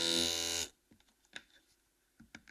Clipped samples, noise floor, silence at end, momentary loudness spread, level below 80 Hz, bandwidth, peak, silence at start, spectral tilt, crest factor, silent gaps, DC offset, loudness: under 0.1%; -75 dBFS; 0.1 s; 25 LU; -68 dBFS; 15.5 kHz; -18 dBFS; 0 s; -1 dB/octave; 24 dB; none; under 0.1%; -34 LUFS